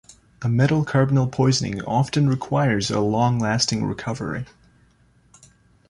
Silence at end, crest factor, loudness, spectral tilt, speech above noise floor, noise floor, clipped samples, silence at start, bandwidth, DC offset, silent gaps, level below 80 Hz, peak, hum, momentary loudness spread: 1.45 s; 18 dB; -21 LUFS; -5.5 dB/octave; 37 dB; -58 dBFS; under 0.1%; 0.4 s; 11 kHz; under 0.1%; none; -50 dBFS; -4 dBFS; none; 9 LU